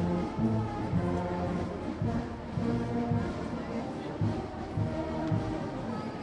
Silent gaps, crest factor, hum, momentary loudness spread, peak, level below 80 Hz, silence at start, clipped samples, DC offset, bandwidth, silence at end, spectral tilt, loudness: none; 16 dB; none; 6 LU; -16 dBFS; -48 dBFS; 0 s; under 0.1%; under 0.1%; 10.5 kHz; 0 s; -8 dB/octave; -33 LUFS